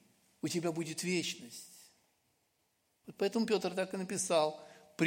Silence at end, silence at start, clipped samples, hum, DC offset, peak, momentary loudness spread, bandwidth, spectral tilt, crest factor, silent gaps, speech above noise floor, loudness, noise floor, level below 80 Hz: 0 s; 0.45 s; under 0.1%; none; under 0.1%; -16 dBFS; 19 LU; 16.5 kHz; -4 dB/octave; 20 dB; none; 43 dB; -35 LUFS; -78 dBFS; -84 dBFS